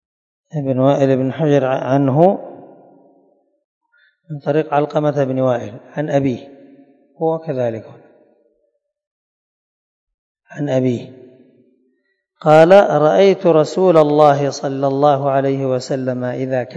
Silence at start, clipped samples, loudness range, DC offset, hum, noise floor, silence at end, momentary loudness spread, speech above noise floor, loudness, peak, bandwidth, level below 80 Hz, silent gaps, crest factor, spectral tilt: 0.55 s; 0.2%; 14 LU; under 0.1%; none; -68 dBFS; 0 s; 14 LU; 53 dB; -15 LUFS; 0 dBFS; 8.2 kHz; -64 dBFS; 3.64-3.81 s, 9.07-10.07 s, 10.14-10.35 s; 16 dB; -7.5 dB/octave